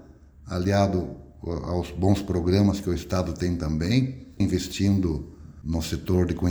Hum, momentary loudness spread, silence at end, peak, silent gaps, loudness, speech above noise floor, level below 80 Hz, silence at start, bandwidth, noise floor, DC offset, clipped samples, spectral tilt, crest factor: none; 11 LU; 0 s; -8 dBFS; none; -25 LUFS; 23 dB; -40 dBFS; 0 s; over 20 kHz; -47 dBFS; under 0.1%; under 0.1%; -7 dB/octave; 18 dB